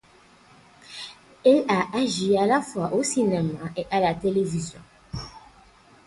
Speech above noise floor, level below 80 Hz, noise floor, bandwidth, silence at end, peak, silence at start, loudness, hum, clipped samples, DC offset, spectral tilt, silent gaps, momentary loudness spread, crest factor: 32 dB; -54 dBFS; -55 dBFS; 11.5 kHz; 0.7 s; -6 dBFS; 0.9 s; -23 LUFS; none; under 0.1%; under 0.1%; -5 dB/octave; none; 18 LU; 18 dB